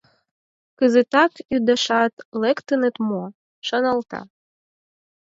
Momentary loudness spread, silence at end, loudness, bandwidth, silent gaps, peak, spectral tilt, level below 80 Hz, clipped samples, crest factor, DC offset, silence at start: 13 LU; 1.05 s; -20 LUFS; 7.8 kHz; 2.13-2.17 s, 2.25-2.32 s, 3.35-3.62 s; -2 dBFS; -4.5 dB/octave; -66 dBFS; under 0.1%; 20 dB; under 0.1%; 0.8 s